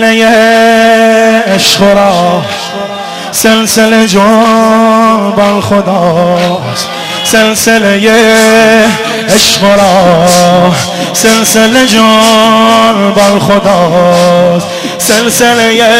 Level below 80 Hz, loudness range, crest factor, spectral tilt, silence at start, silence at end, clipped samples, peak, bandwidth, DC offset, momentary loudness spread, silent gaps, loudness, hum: -38 dBFS; 2 LU; 6 dB; -3.5 dB/octave; 0 s; 0 s; 2%; 0 dBFS; 16.5 kHz; 0.1%; 7 LU; none; -5 LUFS; none